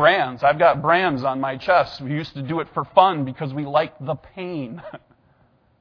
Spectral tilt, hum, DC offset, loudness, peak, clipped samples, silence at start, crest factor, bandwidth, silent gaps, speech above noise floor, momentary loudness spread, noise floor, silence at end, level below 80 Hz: -7.5 dB/octave; none; under 0.1%; -21 LUFS; 0 dBFS; under 0.1%; 0 s; 22 dB; 5.4 kHz; none; 39 dB; 14 LU; -59 dBFS; 0.85 s; -56 dBFS